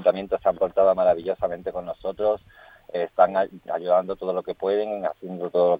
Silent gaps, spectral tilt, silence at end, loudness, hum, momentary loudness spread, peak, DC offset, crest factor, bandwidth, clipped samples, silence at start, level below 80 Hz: none; -8 dB/octave; 0 s; -24 LUFS; none; 11 LU; -4 dBFS; under 0.1%; 20 dB; 4.9 kHz; under 0.1%; 0 s; -58 dBFS